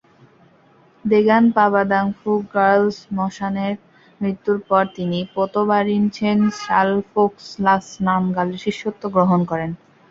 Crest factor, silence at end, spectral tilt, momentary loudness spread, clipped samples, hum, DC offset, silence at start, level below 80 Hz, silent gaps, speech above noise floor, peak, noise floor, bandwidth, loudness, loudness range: 18 dB; 0.35 s; -7 dB/octave; 10 LU; under 0.1%; none; under 0.1%; 1.05 s; -58 dBFS; none; 35 dB; -2 dBFS; -53 dBFS; 7.6 kHz; -19 LUFS; 3 LU